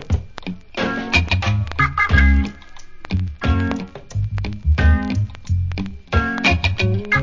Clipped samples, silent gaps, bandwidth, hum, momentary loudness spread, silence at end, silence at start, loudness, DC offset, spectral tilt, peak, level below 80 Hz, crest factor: under 0.1%; none; 7.6 kHz; none; 12 LU; 0 s; 0 s; -20 LUFS; under 0.1%; -6 dB/octave; 0 dBFS; -22 dBFS; 18 dB